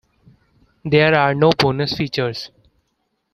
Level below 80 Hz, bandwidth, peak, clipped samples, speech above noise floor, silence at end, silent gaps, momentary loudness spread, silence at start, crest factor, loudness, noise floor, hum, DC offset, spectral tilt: -52 dBFS; 13.5 kHz; 0 dBFS; under 0.1%; 54 dB; 0.85 s; none; 17 LU; 0.85 s; 18 dB; -17 LUFS; -70 dBFS; none; under 0.1%; -6.5 dB/octave